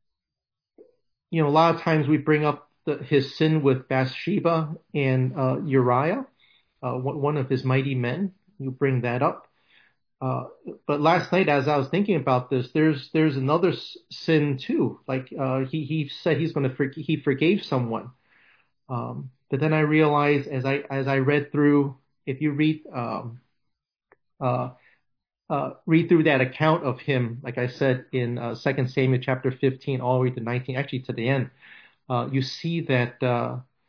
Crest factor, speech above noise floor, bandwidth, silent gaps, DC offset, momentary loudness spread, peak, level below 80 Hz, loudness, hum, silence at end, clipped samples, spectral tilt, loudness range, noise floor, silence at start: 18 dB; 65 dB; 5.4 kHz; none; under 0.1%; 11 LU; -6 dBFS; -70 dBFS; -24 LUFS; none; 0.25 s; under 0.1%; -8.5 dB/octave; 4 LU; -88 dBFS; 1.3 s